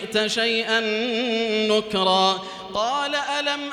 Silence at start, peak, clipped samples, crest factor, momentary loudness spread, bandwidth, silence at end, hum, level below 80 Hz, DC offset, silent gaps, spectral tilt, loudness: 0 s; -6 dBFS; under 0.1%; 16 dB; 5 LU; 14 kHz; 0 s; none; -62 dBFS; under 0.1%; none; -3 dB/octave; -22 LUFS